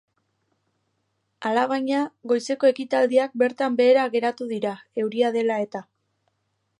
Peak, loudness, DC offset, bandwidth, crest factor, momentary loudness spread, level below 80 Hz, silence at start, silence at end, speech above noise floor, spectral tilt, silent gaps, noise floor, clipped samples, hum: -6 dBFS; -23 LUFS; under 0.1%; 11 kHz; 16 dB; 10 LU; -80 dBFS; 1.4 s; 1 s; 51 dB; -5 dB/octave; none; -74 dBFS; under 0.1%; none